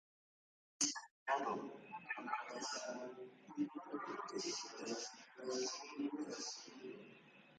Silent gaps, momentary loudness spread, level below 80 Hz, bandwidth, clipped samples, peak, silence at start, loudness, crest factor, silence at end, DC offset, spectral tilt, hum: 1.11-1.26 s; 14 LU; under -90 dBFS; 9.6 kHz; under 0.1%; -24 dBFS; 0.8 s; -44 LUFS; 22 dB; 0 s; under 0.1%; -1.5 dB/octave; none